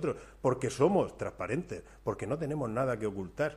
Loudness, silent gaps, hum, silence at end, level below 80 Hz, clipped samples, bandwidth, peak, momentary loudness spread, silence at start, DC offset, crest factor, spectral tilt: -33 LUFS; none; none; 0 s; -56 dBFS; under 0.1%; 13 kHz; -12 dBFS; 10 LU; 0 s; under 0.1%; 20 dB; -6.5 dB/octave